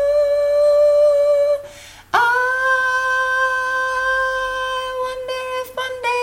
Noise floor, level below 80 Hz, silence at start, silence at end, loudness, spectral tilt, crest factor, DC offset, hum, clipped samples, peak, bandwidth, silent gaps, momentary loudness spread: -39 dBFS; -50 dBFS; 0 s; 0 s; -17 LUFS; -1.5 dB/octave; 14 dB; under 0.1%; none; under 0.1%; -4 dBFS; 16.5 kHz; none; 11 LU